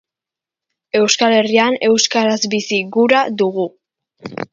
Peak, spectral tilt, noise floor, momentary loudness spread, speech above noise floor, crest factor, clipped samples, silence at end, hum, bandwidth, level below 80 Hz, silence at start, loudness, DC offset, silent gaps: 0 dBFS; -3 dB/octave; -87 dBFS; 10 LU; 72 dB; 16 dB; under 0.1%; 0.1 s; none; 7.6 kHz; -64 dBFS; 0.95 s; -15 LUFS; under 0.1%; none